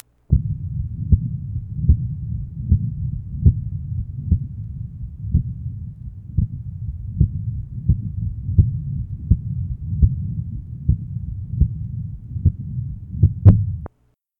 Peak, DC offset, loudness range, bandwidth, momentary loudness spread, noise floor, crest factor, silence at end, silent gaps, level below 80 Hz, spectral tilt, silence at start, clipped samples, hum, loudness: 0 dBFS; under 0.1%; 5 LU; 1.6 kHz; 12 LU; -63 dBFS; 20 dB; 0.55 s; none; -26 dBFS; -13.5 dB/octave; 0.3 s; under 0.1%; none; -23 LUFS